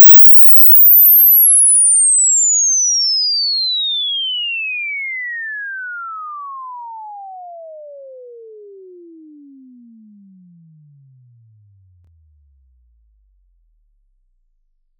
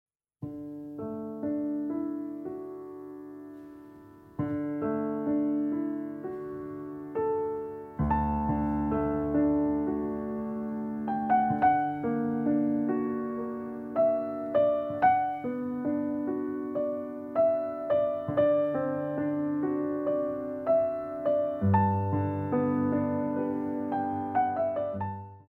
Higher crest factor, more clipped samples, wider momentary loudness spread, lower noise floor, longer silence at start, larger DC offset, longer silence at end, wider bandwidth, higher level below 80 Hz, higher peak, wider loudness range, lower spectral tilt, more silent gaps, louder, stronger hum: about the same, 14 dB vs 18 dB; neither; first, 26 LU vs 13 LU; first, -62 dBFS vs -51 dBFS; second, 0 s vs 0.4 s; neither; first, 6.9 s vs 0.05 s; first, 6.8 kHz vs 3.8 kHz; second, -64 dBFS vs -50 dBFS; first, 0 dBFS vs -12 dBFS; first, 26 LU vs 8 LU; second, 3 dB/octave vs -10.5 dB/octave; neither; first, -7 LUFS vs -30 LUFS; neither